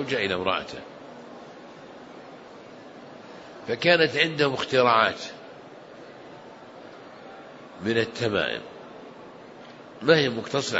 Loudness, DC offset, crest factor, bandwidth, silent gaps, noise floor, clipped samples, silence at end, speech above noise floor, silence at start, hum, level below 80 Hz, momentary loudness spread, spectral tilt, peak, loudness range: -23 LUFS; under 0.1%; 24 dB; 8 kHz; none; -45 dBFS; under 0.1%; 0 s; 21 dB; 0 s; none; -66 dBFS; 24 LU; -4.5 dB/octave; -4 dBFS; 10 LU